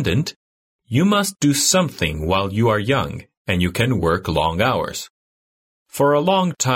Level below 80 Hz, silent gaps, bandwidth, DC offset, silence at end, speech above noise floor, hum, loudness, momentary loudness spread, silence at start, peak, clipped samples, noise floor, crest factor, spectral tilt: -40 dBFS; 0.36-0.79 s, 3.37-3.45 s, 5.10-5.86 s; 16.5 kHz; under 0.1%; 0 s; over 72 dB; none; -19 LUFS; 12 LU; 0 s; -4 dBFS; under 0.1%; under -90 dBFS; 16 dB; -4.5 dB/octave